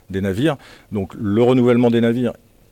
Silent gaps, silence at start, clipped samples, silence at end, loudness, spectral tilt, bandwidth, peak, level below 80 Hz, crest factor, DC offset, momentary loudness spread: none; 0.1 s; under 0.1%; 0.4 s; -18 LUFS; -8 dB/octave; 15 kHz; -4 dBFS; -52 dBFS; 14 dB; under 0.1%; 13 LU